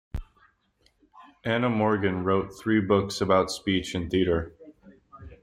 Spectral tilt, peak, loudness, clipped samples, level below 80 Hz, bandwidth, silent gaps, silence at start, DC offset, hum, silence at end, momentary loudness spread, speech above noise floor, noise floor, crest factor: -6 dB/octave; -8 dBFS; -26 LUFS; under 0.1%; -48 dBFS; 15.5 kHz; none; 0.15 s; under 0.1%; none; 0.1 s; 10 LU; 42 dB; -67 dBFS; 18 dB